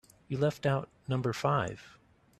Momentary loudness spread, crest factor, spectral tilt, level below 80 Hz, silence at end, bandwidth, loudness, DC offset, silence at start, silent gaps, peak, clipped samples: 9 LU; 20 dB; -6.5 dB/octave; -64 dBFS; 0.5 s; 13 kHz; -32 LUFS; under 0.1%; 0.3 s; none; -14 dBFS; under 0.1%